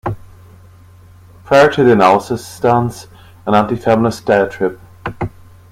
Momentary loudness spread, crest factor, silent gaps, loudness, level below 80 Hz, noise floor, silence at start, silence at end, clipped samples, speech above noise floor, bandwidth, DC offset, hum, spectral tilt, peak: 17 LU; 16 dB; none; -14 LUFS; -44 dBFS; -41 dBFS; 0.05 s; 0.45 s; under 0.1%; 29 dB; 16 kHz; under 0.1%; none; -6.5 dB/octave; 0 dBFS